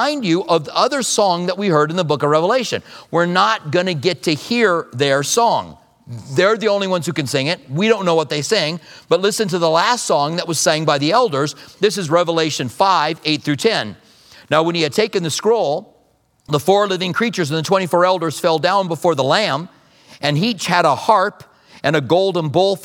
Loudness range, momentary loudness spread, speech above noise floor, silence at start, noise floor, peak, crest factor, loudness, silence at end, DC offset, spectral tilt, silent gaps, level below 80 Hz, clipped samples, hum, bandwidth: 2 LU; 6 LU; 41 dB; 0 s; -58 dBFS; 0 dBFS; 16 dB; -17 LUFS; 0 s; under 0.1%; -4 dB/octave; none; -64 dBFS; under 0.1%; none; 18 kHz